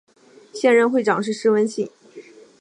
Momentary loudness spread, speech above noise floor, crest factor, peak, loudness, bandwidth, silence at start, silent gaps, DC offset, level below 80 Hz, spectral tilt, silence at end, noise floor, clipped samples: 14 LU; 26 dB; 18 dB; -4 dBFS; -19 LUFS; 11 kHz; 0.55 s; none; under 0.1%; -76 dBFS; -5 dB/octave; 0.4 s; -44 dBFS; under 0.1%